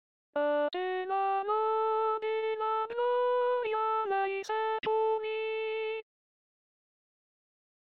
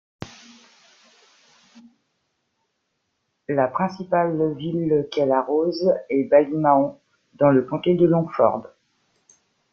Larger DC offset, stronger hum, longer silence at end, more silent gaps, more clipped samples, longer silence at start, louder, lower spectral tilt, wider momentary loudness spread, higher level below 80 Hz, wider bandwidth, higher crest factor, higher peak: neither; neither; first, 1.95 s vs 1.1 s; neither; neither; first, 0.35 s vs 0.2 s; second, -31 LUFS vs -21 LUFS; second, 0 dB/octave vs -8.5 dB/octave; second, 5 LU vs 9 LU; second, -80 dBFS vs -64 dBFS; about the same, 7 kHz vs 7 kHz; second, 12 dB vs 20 dB; second, -20 dBFS vs -2 dBFS